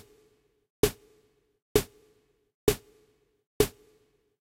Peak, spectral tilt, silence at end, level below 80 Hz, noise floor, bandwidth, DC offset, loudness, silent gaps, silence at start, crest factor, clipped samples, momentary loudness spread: -8 dBFS; -4 dB/octave; 0.75 s; -48 dBFS; -67 dBFS; 16 kHz; under 0.1%; -30 LUFS; 1.62-1.75 s, 2.54-2.67 s, 3.47-3.60 s; 0.85 s; 26 dB; under 0.1%; 9 LU